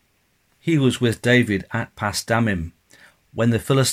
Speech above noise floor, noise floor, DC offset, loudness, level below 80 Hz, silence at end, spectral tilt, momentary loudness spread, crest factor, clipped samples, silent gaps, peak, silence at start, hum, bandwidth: 45 dB; -64 dBFS; under 0.1%; -21 LUFS; -48 dBFS; 0 s; -5 dB/octave; 11 LU; 18 dB; under 0.1%; none; -4 dBFS; 0.65 s; none; 16 kHz